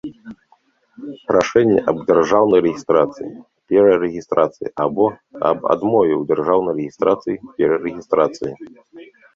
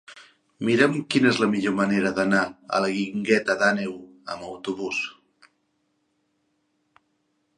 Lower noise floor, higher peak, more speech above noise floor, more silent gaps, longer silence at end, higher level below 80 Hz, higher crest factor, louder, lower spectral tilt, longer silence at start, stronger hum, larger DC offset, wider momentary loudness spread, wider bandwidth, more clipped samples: second, -58 dBFS vs -72 dBFS; about the same, -2 dBFS vs -4 dBFS; second, 41 dB vs 49 dB; neither; second, 0.3 s vs 2.45 s; first, -56 dBFS vs -66 dBFS; second, 16 dB vs 22 dB; first, -17 LUFS vs -23 LUFS; first, -6.5 dB/octave vs -5 dB/octave; about the same, 0.05 s vs 0.1 s; neither; neither; about the same, 15 LU vs 13 LU; second, 7.6 kHz vs 11 kHz; neither